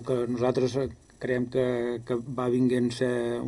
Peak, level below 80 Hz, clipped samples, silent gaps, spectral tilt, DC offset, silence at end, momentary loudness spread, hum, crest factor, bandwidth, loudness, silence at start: -12 dBFS; -58 dBFS; under 0.1%; none; -7 dB/octave; under 0.1%; 0 s; 7 LU; none; 16 dB; 11.5 kHz; -28 LUFS; 0 s